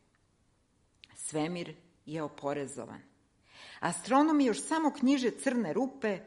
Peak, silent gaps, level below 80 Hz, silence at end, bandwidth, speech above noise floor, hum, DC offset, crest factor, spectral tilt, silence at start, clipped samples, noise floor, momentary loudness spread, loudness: -14 dBFS; none; -74 dBFS; 0 s; 11.5 kHz; 40 dB; none; under 0.1%; 18 dB; -4.5 dB/octave; 1.15 s; under 0.1%; -71 dBFS; 17 LU; -31 LUFS